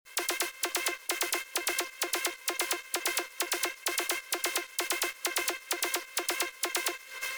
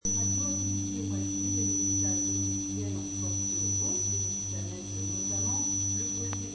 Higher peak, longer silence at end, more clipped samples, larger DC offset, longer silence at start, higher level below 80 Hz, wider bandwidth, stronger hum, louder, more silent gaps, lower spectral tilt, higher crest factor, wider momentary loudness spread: about the same, -16 dBFS vs -16 dBFS; about the same, 0 s vs 0 s; neither; neither; about the same, 0.05 s vs 0.05 s; second, -76 dBFS vs -58 dBFS; first, over 20 kHz vs 9.2 kHz; second, none vs 50 Hz at -40 dBFS; about the same, -31 LUFS vs -29 LUFS; neither; second, 2 dB/octave vs -4 dB/octave; about the same, 18 dB vs 14 dB; second, 2 LU vs 7 LU